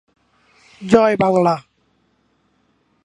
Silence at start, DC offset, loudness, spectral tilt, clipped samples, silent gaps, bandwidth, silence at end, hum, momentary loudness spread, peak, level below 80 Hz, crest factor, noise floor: 0.8 s; under 0.1%; -16 LUFS; -7 dB/octave; under 0.1%; none; 11 kHz; 1.45 s; none; 12 LU; 0 dBFS; -60 dBFS; 20 dB; -63 dBFS